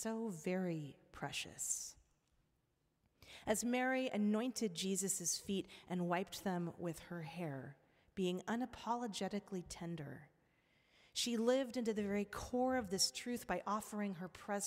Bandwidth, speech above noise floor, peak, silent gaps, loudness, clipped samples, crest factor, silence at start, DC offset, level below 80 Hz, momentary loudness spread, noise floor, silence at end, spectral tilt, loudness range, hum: 16 kHz; 41 dB; -22 dBFS; none; -41 LUFS; under 0.1%; 20 dB; 0 s; under 0.1%; -70 dBFS; 12 LU; -82 dBFS; 0 s; -4 dB/octave; 6 LU; none